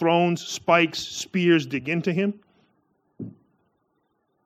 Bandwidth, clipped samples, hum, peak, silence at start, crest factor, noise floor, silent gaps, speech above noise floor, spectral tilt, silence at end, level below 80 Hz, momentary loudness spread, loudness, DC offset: 15 kHz; under 0.1%; none; -4 dBFS; 0 s; 22 dB; -72 dBFS; none; 49 dB; -5 dB/octave; 1.15 s; -68 dBFS; 20 LU; -23 LUFS; under 0.1%